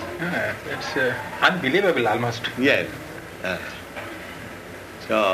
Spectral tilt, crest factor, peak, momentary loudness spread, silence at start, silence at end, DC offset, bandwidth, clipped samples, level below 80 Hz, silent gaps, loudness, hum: -4.5 dB/octave; 22 dB; -2 dBFS; 17 LU; 0 s; 0 s; under 0.1%; 15.5 kHz; under 0.1%; -56 dBFS; none; -23 LUFS; none